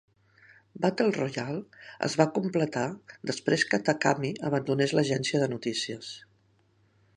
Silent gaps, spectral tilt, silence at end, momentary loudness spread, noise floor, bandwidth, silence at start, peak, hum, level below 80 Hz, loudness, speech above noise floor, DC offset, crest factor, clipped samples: none; -5 dB/octave; 0.95 s; 11 LU; -66 dBFS; 11 kHz; 0.75 s; -6 dBFS; none; -72 dBFS; -28 LUFS; 38 dB; under 0.1%; 24 dB; under 0.1%